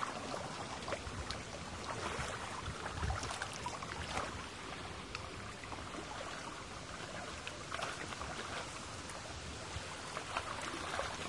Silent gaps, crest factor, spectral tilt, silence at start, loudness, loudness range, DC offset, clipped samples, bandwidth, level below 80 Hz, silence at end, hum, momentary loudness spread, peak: none; 22 dB; -3.5 dB/octave; 0 s; -43 LUFS; 3 LU; under 0.1%; under 0.1%; 11.5 kHz; -56 dBFS; 0 s; none; 5 LU; -20 dBFS